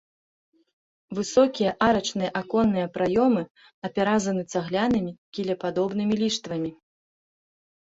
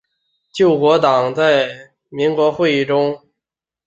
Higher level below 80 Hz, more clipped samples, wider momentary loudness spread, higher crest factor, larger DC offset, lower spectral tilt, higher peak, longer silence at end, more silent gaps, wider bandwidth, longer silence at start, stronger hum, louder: about the same, -58 dBFS vs -60 dBFS; neither; about the same, 11 LU vs 13 LU; about the same, 20 dB vs 16 dB; neither; about the same, -5 dB/octave vs -6 dB/octave; second, -6 dBFS vs -2 dBFS; first, 1.1 s vs 0.7 s; first, 3.50-3.55 s, 3.74-3.82 s, 5.18-5.32 s vs none; about the same, 8 kHz vs 7.8 kHz; first, 1.1 s vs 0.55 s; neither; second, -25 LUFS vs -15 LUFS